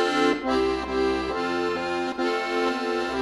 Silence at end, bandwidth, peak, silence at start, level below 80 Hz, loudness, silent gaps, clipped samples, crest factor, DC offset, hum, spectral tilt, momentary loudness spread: 0 s; 12 kHz; -10 dBFS; 0 s; -48 dBFS; -25 LUFS; none; under 0.1%; 14 dB; under 0.1%; none; -4.5 dB/octave; 4 LU